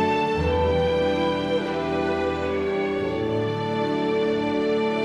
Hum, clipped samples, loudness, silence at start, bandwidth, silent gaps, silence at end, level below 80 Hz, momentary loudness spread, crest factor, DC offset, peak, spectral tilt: none; under 0.1%; -24 LUFS; 0 s; 11 kHz; none; 0 s; -42 dBFS; 4 LU; 12 dB; under 0.1%; -10 dBFS; -7 dB/octave